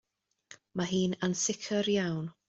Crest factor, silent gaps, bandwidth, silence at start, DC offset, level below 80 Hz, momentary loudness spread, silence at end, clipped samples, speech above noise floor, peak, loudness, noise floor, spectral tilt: 18 dB; none; 8.2 kHz; 0.5 s; under 0.1%; -68 dBFS; 6 LU; 0.15 s; under 0.1%; 27 dB; -16 dBFS; -31 LUFS; -58 dBFS; -4 dB/octave